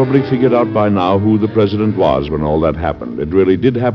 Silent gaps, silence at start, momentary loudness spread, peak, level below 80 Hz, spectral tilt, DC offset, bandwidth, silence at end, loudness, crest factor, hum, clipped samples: none; 0 s; 4 LU; 0 dBFS; -34 dBFS; -7 dB/octave; under 0.1%; 6.2 kHz; 0 s; -14 LUFS; 14 dB; none; under 0.1%